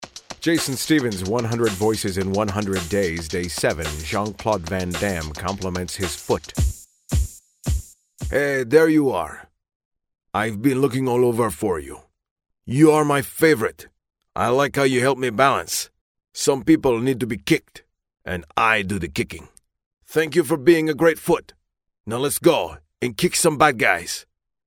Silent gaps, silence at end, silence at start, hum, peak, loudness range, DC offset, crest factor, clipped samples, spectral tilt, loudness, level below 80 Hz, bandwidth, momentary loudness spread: 9.75-9.91 s, 12.31-12.36 s, 16.01-16.15 s, 19.86-19.91 s, 22.00-22.04 s; 0.45 s; 0 s; none; 0 dBFS; 5 LU; under 0.1%; 20 dB; under 0.1%; -5 dB/octave; -21 LUFS; -38 dBFS; 17 kHz; 12 LU